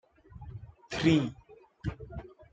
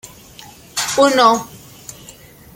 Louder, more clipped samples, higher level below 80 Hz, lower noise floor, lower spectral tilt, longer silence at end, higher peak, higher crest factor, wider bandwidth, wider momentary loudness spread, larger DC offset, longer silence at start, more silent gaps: second, -31 LUFS vs -15 LUFS; neither; about the same, -52 dBFS vs -54 dBFS; first, -49 dBFS vs -41 dBFS; first, -6.5 dB/octave vs -2.5 dB/octave; second, 0.1 s vs 0.45 s; second, -12 dBFS vs 0 dBFS; about the same, 22 dB vs 18 dB; second, 8.8 kHz vs 17 kHz; second, 21 LU vs 25 LU; neither; second, 0.35 s vs 0.75 s; neither